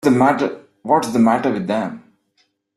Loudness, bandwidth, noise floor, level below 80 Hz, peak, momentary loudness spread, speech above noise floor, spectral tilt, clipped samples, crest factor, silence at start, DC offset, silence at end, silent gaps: -18 LUFS; 13 kHz; -65 dBFS; -60 dBFS; -2 dBFS; 14 LU; 48 dB; -6.5 dB/octave; under 0.1%; 16 dB; 0.05 s; under 0.1%; 0.8 s; none